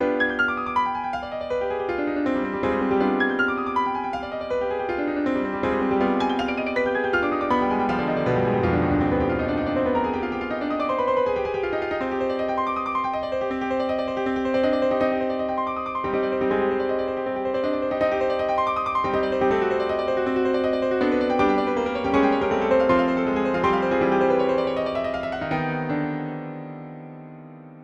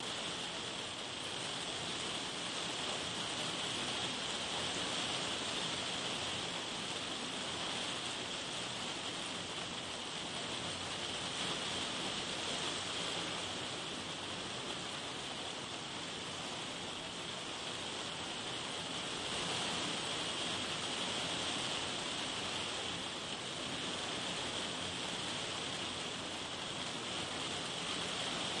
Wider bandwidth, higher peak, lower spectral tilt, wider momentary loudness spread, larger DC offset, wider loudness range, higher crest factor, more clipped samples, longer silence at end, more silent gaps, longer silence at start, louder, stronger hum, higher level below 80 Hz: second, 7.8 kHz vs 11.5 kHz; first, -8 dBFS vs -24 dBFS; first, -7 dB/octave vs -2 dB/octave; about the same, 6 LU vs 4 LU; neither; about the same, 3 LU vs 4 LU; about the same, 14 dB vs 16 dB; neither; about the same, 0 s vs 0 s; neither; about the same, 0 s vs 0 s; first, -23 LUFS vs -38 LUFS; neither; first, -48 dBFS vs -70 dBFS